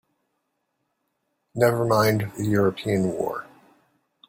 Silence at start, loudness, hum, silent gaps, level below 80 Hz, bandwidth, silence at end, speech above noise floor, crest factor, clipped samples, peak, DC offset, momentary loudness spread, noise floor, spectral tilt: 1.55 s; -23 LUFS; none; none; -58 dBFS; 16.5 kHz; 0.85 s; 54 dB; 20 dB; under 0.1%; -4 dBFS; under 0.1%; 10 LU; -76 dBFS; -6.5 dB/octave